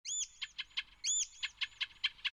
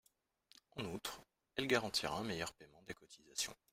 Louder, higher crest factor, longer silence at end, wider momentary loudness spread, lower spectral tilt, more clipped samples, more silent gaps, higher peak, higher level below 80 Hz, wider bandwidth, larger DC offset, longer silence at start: first, -37 LUFS vs -41 LUFS; second, 20 dB vs 26 dB; second, 0.05 s vs 0.2 s; second, 8 LU vs 18 LU; second, 5 dB/octave vs -3 dB/octave; neither; neither; second, -22 dBFS vs -18 dBFS; about the same, -72 dBFS vs -70 dBFS; about the same, 15 kHz vs 16 kHz; neither; second, 0.05 s vs 0.75 s